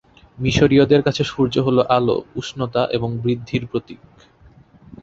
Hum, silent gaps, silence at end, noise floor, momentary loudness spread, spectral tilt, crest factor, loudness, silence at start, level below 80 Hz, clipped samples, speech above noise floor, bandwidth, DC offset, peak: none; none; 0.05 s; -49 dBFS; 11 LU; -6.5 dB/octave; 18 dB; -19 LUFS; 0.4 s; -44 dBFS; under 0.1%; 31 dB; 7.8 kHz; under 0.1%; -2 dBFS